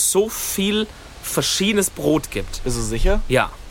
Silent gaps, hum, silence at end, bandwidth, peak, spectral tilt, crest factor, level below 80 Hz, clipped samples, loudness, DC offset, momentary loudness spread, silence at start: none; none; 0 s; 17 kHz; -4 dBFS; -3.5 dB/octave; 18 dB; -28 dBFS; under 0.1%; -21 LUFS; under 0.1%; 9 LU; 0 s